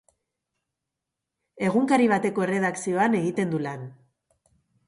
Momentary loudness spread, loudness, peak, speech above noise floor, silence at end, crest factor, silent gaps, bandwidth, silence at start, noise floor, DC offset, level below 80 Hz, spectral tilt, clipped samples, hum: 11 LU; -24 LUFS; -8 dBFS; 62 dB; 0.95 s; 18 dB; none; 11.5 kHz; 1.55 s; -85 dBFS; under 0.1%; -70 dBFS; -6 dB/octave; under 0.1%; none